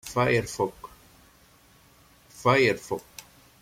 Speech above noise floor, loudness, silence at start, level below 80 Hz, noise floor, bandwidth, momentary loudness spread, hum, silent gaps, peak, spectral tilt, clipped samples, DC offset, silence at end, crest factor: 33 dB; -25 LUFS; 0.05 s; -58 dBFS; -57 dBFS; 16.5 kHz; 25 LU; none; none; -8 dBFS; -5 dB/octave; under 0.1%; under 0.1%; 0.4 s; 20 dB